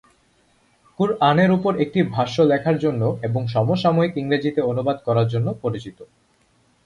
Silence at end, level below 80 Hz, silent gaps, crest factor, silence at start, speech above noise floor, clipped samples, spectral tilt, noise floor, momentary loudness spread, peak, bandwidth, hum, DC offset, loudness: 0.8 s; -56 dBFS; none; 18 dB; 1 s; 41 dB; under 0.1%; -8 dB/octave; -61 dBFS; 7 LU; -2 dBFS; 10.5 kHz; none; under 0.1%; -20 LUFS